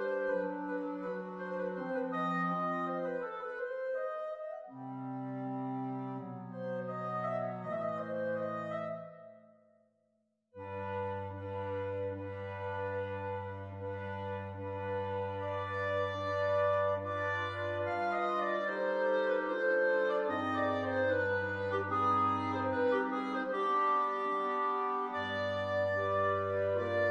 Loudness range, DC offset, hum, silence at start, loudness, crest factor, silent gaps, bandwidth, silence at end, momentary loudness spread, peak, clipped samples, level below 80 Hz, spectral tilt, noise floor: 8 LU; under 0.1%; none; 0 s; -35 LUFS; 14 dB; none; 8 kHz; 0 s; 10 LU; -20 dBFS; under 0.1%; -78 dBFS; -7.5 dB/octave; -78 dBFS